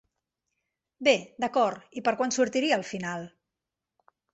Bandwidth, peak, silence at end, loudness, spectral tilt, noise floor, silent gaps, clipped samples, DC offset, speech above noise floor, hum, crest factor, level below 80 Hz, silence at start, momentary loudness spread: 8.2 kHz; -8 dBFS; 1.05 s; -27 LUFS; -3.5 dB/octave; -88 dBFS; none; under 0.1%; under 0.1%; 61 dB; none; 22 dB; -72 dBFS; 1 s; 10 LU